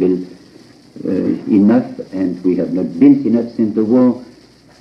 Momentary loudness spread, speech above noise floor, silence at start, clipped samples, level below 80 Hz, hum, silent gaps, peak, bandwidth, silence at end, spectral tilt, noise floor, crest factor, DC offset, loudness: 12 LU; 31 dB; 0 s; under 0.1%; -58 dBFS; none; none; 0 dBFS; 6.2 kHz; 0.55 s; -9.5 dB/octave; -45 dBFS; 14 dB; under 0.1%; -15 LUFS